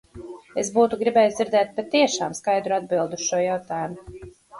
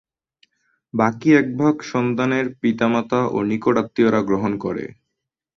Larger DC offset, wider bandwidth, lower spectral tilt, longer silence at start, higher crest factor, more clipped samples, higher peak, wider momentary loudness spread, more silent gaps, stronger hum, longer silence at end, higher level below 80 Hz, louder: neither; first, 11.5 kHz vs 7.2 kHz; second, -3.5 dB/octave vs -7 dB/octave; second, 0.15 s vs 0.95 s; about the same, 18 dB vs 18 dB; neither; second, -6 dBFS vs -2 dBFS; first, 14 LU vs 9 LU; neither; neither; second, 0 s vs 0.7 s; about the same, -58 dBFS vs -58 dBFS; second, -23 LUFS vs -20 LUFS